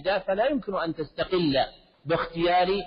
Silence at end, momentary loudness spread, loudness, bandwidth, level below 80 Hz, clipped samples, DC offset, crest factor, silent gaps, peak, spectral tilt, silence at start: 0 s; 8 LU; -26 LUFS; 5.2 kHz; -50 dBFS; under 0.1%; under 0.1%; 14 dB; none; -12 dBFS; -3.5 dB/octave; 0 s